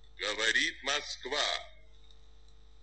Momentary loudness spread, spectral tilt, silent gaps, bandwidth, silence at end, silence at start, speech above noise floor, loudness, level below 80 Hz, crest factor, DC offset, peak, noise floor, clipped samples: 8 LU; 0 dB/octave; none; 8.8 kHz; 1.1 s; 0.15 s; 24 dB; -31 LUFS; -58 dBFS; 20 dB; 0.2%; -16 dBFS; -58 dBFS; under 0.1%